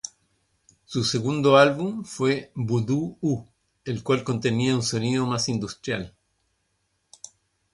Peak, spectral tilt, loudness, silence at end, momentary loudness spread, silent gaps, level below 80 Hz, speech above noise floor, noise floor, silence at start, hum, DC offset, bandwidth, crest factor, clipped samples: -4 dBFS; -5 dB/octave; -24 LUFS; 1.65 s; 20 LU; none; -58 dBFS; 49 dB; -73 dBFS; 0.05 s; none; under 0.1%; 11.5 kHz; 22 dB; under 0.1%